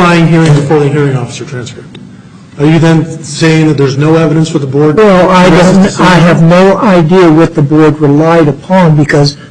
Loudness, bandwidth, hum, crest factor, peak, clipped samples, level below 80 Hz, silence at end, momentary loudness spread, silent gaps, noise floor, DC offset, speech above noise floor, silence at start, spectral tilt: -6 LUFS; 10 kHz; none; 6 dB; 0 dBFS; 0.2%; -34 dBFS; 0.05 s; 7 LU; none; -31 dBFS; under 0.1%; 25 dB; 0 s; -7 dB/octave